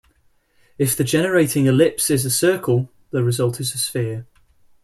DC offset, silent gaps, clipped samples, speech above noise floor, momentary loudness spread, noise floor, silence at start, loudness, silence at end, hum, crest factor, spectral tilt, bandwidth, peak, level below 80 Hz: under 0.1%; none; under 0.1%; 41 dB; 8 LU; -60 dBFS; 0.8 s; -19 LUFS; 0.6 s; none; 16 dB; -5 dB/octave; 15.5 kHz; -4 dBFS; -54 dBFS